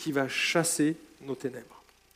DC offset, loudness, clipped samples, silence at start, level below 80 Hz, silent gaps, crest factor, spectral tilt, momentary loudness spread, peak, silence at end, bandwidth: under 0.1%; -28 LUFS; under 0.1%; 0 s; -70 dBFS; none; 18 dB; -3.5 dB/octave; 15 LU; -12 dBFS; 0.35 s; 16 kHz